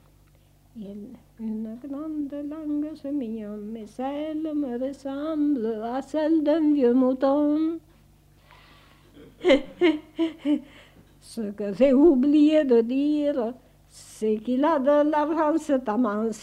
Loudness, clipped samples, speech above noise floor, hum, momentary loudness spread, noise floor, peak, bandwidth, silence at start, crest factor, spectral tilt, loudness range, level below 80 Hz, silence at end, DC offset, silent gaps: -24 LUFS; under 0.1%; 33 dB; 50 Hz at -65 dBFS; 16 LU; -57 dBFS; -6 dBFS; 11 kHz; 0.75 s; 18 dB; -6 dB/octave; 10 LU; -56 dBFS; 0 s; under 0.1%; none